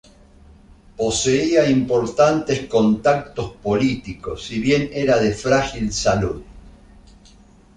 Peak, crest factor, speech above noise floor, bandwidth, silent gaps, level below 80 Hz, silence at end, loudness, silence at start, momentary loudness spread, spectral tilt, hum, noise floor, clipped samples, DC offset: -2 dBFS; 18 dB; 30 dB; 11 kHz; none; -42 dBFS; 1.05 s; -19 LUFS; 1 s; 11 LU; -5 dB/octave; none; -49 dBFS; under 0.1%; under 0.1%